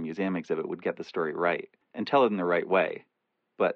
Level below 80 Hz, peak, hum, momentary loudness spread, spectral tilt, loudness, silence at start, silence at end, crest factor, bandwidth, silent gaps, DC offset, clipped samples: -78 dBFS; -10 dBFS; none; 10 LU; -7 dB/octave; -28 LUFS; 0 s; 0 s; 18 dB; 7 kHz; none; under 0.1%; under 0.1%